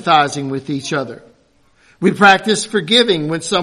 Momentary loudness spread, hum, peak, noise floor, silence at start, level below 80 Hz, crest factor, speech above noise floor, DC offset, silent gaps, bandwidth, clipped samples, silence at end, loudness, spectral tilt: 12 LU; none; 0 dBFS; -54 dBFS; 0 s; -58 dBFS; 16 dB; 40 dB; under 0.1%; none; 12.5 kHz; under 0.1%; 0 s; -14 LUFS; -3.5 dB/octave